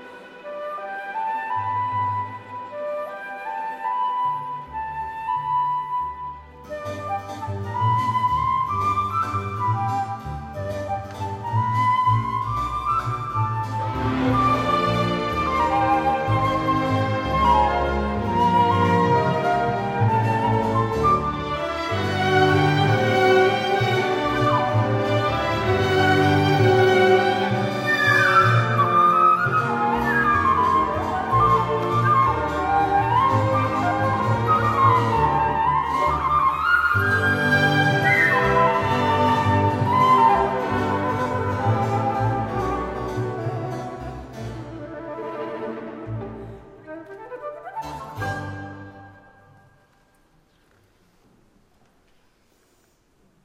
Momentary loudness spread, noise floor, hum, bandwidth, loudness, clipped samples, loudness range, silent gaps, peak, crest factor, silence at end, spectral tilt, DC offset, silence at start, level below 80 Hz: 15 LU; -61 dBFS; none; 15.5 kHz; -21 LUFS; under 0.1%; 14 LU; none; -6 dBFS; 16 dB; 4.35 s; -6.5 dB/octave; under 0.1%; 0 s; -42 dBFS